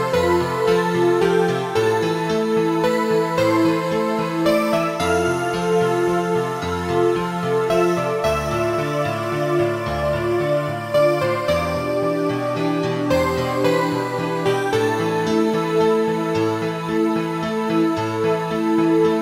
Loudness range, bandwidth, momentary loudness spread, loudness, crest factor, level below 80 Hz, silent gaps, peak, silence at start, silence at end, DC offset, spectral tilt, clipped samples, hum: 2 LU; 16 kHz; 4 LU; -20 LUFS; 14 dB; -46 dBFS; none; -6 dBFS; 0 s; 0 s; under 0.1%; -6 dB/octave; under 0.1%; none